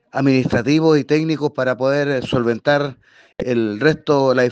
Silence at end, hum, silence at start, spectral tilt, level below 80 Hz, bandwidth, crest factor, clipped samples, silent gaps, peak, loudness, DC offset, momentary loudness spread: 0 s; none; 0.15 s; -6.5 dB/octave; -50 dBFS; 8.4 kHz; 16 dB; under 0.1%; none; 0 dBFS; -18 LUFS; under 0.1%; 5 LU